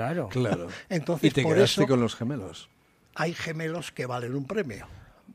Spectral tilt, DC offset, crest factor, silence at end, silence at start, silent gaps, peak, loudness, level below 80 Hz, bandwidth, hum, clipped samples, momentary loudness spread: -5.5 dB/octave; under 0.1%; 22 dB; 0 s; 0 s; none; -6 dBFS; -27 LUFS; -58 dBFS; 15.5 kHz; none; under 0.1%; 15 LU